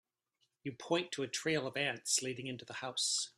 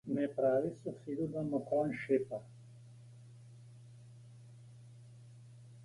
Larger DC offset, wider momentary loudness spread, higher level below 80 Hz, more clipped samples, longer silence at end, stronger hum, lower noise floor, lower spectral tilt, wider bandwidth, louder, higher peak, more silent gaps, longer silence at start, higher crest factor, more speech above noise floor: neither; second, 11 LU vs 24 LU; second, -80 dBFS vs -74 dBFS; neither; about the same, 0.1 s vs 0 s; neither; first, -81 dBFS vs -56 dBFS; second, -2 dB/octave vs -8.5 dB/octave; first, 14.5 kHz vs 11.5 kHz; about the same, -36 LUFS vs -36 LUFS; about the same, -18 dBFS vs -20 dBFS; neither; first, 0.65 s vs 0.05 s; about the same, 20 dB vs 20 dB; first, 44 dB vs 20 dB